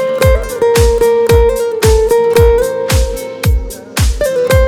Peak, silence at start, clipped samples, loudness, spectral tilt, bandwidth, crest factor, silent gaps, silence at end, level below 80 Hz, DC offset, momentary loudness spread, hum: 0 dBFS; 0 s; under 0.1%; -12 LUFS; -5 dB/octave; 18.5 kHz; 10 dB; none; 0 s; -16 dBFS; under 0.1%; 6 LU; none